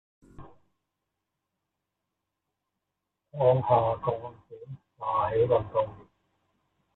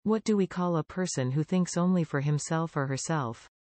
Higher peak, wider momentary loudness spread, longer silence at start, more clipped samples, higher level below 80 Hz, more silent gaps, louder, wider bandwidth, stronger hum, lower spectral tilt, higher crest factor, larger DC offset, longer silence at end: first, -10 dBFS vs -16 dBFS; first, 22 LU vs 4 LU; first, 0.4 s vs 0.05 s; neither; first, -60 dBFS vs -66 dBFS; neither; about the same, -27 LUFS vs -29 LUFS; second, 4.1 kHz vs 8.8 kHz; neither; about the same, -7 dB/octave vs -6 dB/octave; first, 22 dB vs 12 dB; neither; first, 0.95 s vs 0.3 s